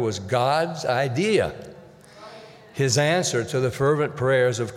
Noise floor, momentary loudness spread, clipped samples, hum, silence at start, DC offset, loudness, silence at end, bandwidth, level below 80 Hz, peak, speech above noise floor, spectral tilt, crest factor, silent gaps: -46 dBFS; 20 LU; under 0.1%; none; 0 s; under 0.1%; -22 LUFS; 0 s; 15 kHz; -56 dBFS; -8 dBFS; 24 dB; -4.5 dB/octave; 16 dB; none